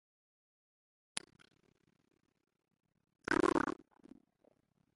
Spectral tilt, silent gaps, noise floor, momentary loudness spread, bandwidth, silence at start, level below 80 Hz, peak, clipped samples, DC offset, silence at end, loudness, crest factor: -4 dB/octave; none; -75 dBFS; 16 LU; 11.5 kHz; 1.15 s; -68 dBFS; -16 dBFS; under 0.1%; under 0.1%; 1.25 s; -36 LUFS; 26 dB